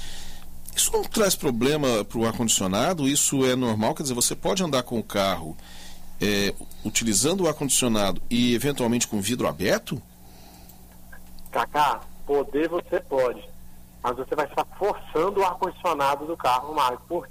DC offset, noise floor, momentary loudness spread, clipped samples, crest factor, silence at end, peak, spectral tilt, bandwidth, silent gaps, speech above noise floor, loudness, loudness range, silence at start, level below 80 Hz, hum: under 0.1%; -46 dBFS; 11 LU; under 0.1%; 16 dB; 0 s; -10 dBFS; -3.5 dB/octave; 16 kHz; none; 22 dB; -24 LUFS; 5 LU; 0 s; -42 dBFS; 60 Hz at -50 dBFS